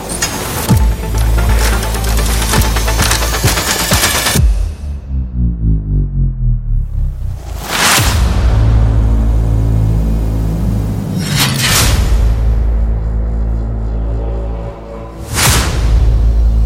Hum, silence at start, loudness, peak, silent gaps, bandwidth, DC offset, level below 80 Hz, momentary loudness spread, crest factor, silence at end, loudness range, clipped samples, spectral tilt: none; 0 s; -14 LUFS; 0 dBFS; none; 17 kHz; 0.3%; -14 dBFS; 10 LU; 12 dB; 0 s; 4 LU; under 0.1%; -4 dB/octave